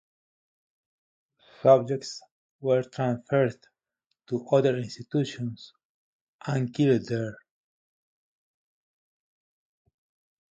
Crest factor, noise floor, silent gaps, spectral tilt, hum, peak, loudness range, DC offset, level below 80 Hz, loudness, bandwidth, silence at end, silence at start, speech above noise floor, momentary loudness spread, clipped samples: 22 dB; -81 dBFS; 2.31-2.59 s, 5.85-6.39 s; -7 dB/octave; none; -8 dBFS; 4 LU; under 0.1%; -70 dBFS; -26 LUFS; 9 kHz; 3.2 s; 1.65 s; 56 dB; 15 LU; under 0.1%